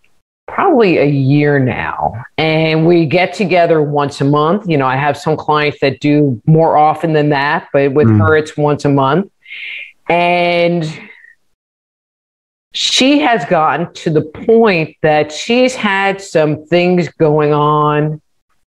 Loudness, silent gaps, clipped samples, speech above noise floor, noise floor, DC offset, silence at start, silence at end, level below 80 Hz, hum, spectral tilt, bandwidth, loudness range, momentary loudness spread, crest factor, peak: -12 LUFS; 11.54-12.71 s; under 0.1%; over 78 dB; under -90 dBFS; under 0.1%; 0.5 s; 0.55 s; -50 dBFS; none; -6 dB/octave; 11.5 kHz; 4 LU; 7 LU; 12 dB; 0 dBFS